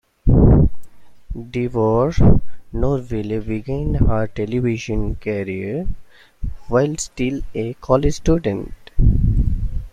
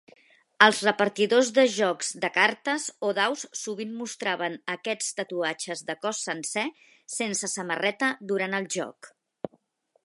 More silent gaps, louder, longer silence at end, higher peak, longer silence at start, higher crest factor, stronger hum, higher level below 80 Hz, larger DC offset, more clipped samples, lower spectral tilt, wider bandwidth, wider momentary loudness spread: neither; first, -20 LUFS vs -26 LUFS; second, 0.05 s vs 0.55 s; about the same, -2 dBFS vs 0 dBFS; second, 0.25 s vs 0.6 s; second, 16 dB vs 28 dB; neither; first, -24 dBFS vs -80 dBFS; neither; neither; first, -7.5 dB/octave vs -2.5 dB/octave; second, 9.8 kHz vs 11.5 kHz; about the same, 13 LU vs 13 LU